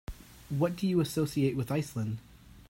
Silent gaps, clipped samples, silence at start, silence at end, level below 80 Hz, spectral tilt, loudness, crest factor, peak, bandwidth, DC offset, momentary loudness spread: none; under 0.1%; 0.1 s; 0.05 s; -54 dBFS; -7 dB/octave; -31 LUFS; 16 dB; -16 dBFS; 16.5 kHz; under 0.1%; 13 LU